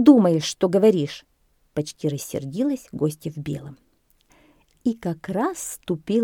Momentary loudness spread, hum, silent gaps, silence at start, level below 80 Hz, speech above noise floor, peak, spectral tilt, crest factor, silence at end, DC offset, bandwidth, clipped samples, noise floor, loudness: 14 LU; none; none; 0 s; -60 dBFS; 40 dB; -2 dBFS; -6 dB/octave; 20 dB; 0 s; under 0.1%; 17.5 kHz; under 0.1%; -61 dBFS; -24 LUFS